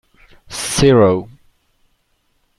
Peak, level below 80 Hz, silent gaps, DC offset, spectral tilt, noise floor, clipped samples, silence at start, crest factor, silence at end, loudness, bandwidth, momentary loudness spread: 0 dBFS; -40 dBFS; none; under 0.1%; -5 dB/octave; -63 dBFS; under 0.1%; 0.5 s; 18 dB; 1.35 s; -14 LUFS; 13 kHz; 14 LU